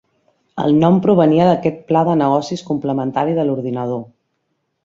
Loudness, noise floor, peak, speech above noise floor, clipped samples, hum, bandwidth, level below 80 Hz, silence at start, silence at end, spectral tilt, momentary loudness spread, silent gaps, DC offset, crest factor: -16 LUFS; -70 dBFS; -2 dBFS; 55 dB; under 0.1%; none; 7.6 kHz; -56 dBFS; 0.55 s; 0.8 s; -8 dB/octave; 10 LU; none; under 0.1%; 14 dB